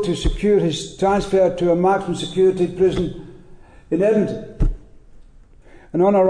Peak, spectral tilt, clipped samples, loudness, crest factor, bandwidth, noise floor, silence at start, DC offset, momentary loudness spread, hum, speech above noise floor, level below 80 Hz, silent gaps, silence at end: -6 dBFS; -6.5 dB/octave; under 0.1%; -19 LUFS; 12 dB; 10 kHz; -45 dBFS; 0 s; under 0.1%; 9 LU; none; 28 dB; -30 dBFS; none; 0 s